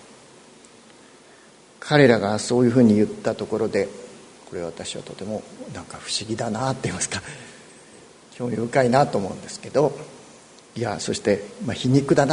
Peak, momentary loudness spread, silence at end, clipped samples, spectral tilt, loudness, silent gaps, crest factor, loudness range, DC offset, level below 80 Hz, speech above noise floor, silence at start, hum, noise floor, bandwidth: 0 dBFS; 20 LU; 0 s; under 0.1%; -5.5 dB/octave; -22 LUFS; none; 24 dB; 8 LU; under 0.1%; -58 dBFS; 28 dB; 1.8 s; none; -50 dBFS; 11 kHz